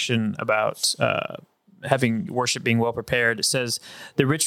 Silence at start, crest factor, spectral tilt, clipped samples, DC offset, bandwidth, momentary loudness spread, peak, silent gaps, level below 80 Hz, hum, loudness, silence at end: 0 s; 22 dB; -3.5 dB/octave; under 0.1%; under 0.1%; 18 kHz; 8 LU; -2 dBFS; none; -58 dBFS; none; -23 LUFS; 0 s